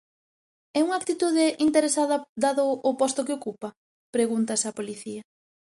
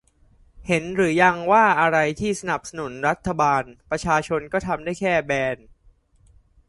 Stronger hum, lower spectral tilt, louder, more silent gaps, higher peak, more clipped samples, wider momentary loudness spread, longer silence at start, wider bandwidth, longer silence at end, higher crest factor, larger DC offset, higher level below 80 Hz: neither; second, -3 dB/octave vs -5 dB/octave; second, -25 LUFS vs -21 LUFS; first, 2.29-2.36 s, 3.77-4.13 s vs none; second, -8 dBFS vs -2 dBFS; neither; first, 14 LU vs 11 LU; first, 0.75 s vs 0.6 s; about the same, 11.5 kHz vs 11.5 kHz; second, 0.55 s vs 1.15 s; about the same, 18 dB vs 22 dB; neither; second, -72 dBFS vs -50 dBFS